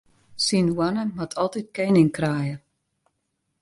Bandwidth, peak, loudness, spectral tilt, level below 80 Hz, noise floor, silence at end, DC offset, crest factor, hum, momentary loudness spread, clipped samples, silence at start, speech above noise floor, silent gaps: 11.5 kHz; -6 dBFS; -23 LUFS; -5.5 dB/octave; -58 dBFS; -76 dBFS; 1.05 s; under 0.1%; 18 dB; none; 11 LU; under 0.1%; 0.35 s; 54 dB; none